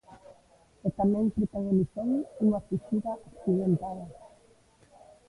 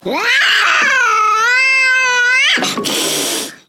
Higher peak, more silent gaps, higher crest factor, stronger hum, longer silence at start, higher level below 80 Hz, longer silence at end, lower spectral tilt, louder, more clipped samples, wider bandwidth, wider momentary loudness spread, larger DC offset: second, -16 dBFS vs 0 dBFS; neither; about the same, 16 dB vs 12 dB; neither; about the same, 0.1 s vs 0.05 s; first, -56 dBFS vs -66 dBFS; first, 1 s vs 0.15 s; first, -10.5 dB/octave vs 0 dB/octave; second, -29 LUFS vs -11 LUFS; neither; second, 11 kHz vs 18 kHz; first, 10 LU vs 6 LU; neither